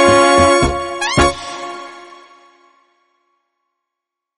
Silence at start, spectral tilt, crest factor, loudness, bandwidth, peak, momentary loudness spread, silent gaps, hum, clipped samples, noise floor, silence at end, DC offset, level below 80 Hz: 0 s; -4 dB/octave; 16 dB; -13 LUFS; 11.5 kHz; 0 dBFS; 20 LU; none; none; under 0.1%; -81 dBFS; 2.35 s; under 0.1%; -34 dBFS